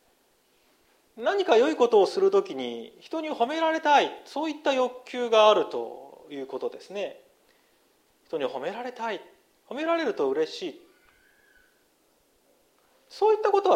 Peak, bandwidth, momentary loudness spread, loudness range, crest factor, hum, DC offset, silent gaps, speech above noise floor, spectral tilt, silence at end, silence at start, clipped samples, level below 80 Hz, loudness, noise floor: -6 dBFS; 11.5 kHz; 16 LU; 11 LU; 20 dB; none; under 0.1%; none; 41 dB; -3.5 dB/octave; 0 s; 1.15 s; under 0.1%; -78 dBFS; -26 LUFS; -66 dBFS